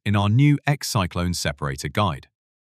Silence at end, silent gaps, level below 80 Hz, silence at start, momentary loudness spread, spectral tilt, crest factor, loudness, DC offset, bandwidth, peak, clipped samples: 0.45 s; none; -44 dBFS; 0.05 s; 8 LU; -5.5 dB/octave; 18 dB; -22 LUFS; under 0.1%; 15 kHz; -4 dBFS; under 0.1%